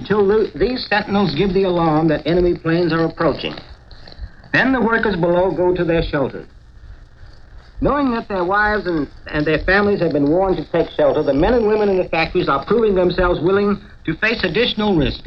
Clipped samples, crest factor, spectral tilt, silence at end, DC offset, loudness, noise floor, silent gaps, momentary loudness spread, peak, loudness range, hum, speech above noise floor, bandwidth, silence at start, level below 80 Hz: under 0.1%; 16 dB; -8 dB/octave; 0 s; 0.1%; -17 LUFS; -40 dBFS; none; 7 LU; -2 dBFS; 4 LU; none; 23 dB; 6.6 kHz; 0 s; -34 dBFS